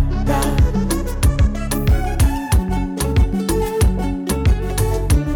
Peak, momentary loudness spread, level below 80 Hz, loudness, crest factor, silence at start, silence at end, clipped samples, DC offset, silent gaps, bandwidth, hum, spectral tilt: -6 dBFS; 3 LU; -18 dBFS; -19 LUFS; 10 dB; 0 s; 0 s; under 0.1%; under 0.1%; none; 19 kHz; none; -6 dB/octave